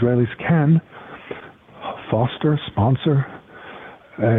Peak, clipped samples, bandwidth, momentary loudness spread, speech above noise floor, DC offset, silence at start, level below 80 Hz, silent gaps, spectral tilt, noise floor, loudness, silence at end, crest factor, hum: -6 dBFS; under 0.1%; 3.9 kHz; 21 LU; 23 dB; under 0.1%; 0 s; -52 dBFS; none; -10.5 dB/octave; -41 dBFS; -20 LUFS; 0 s; 14 dB; none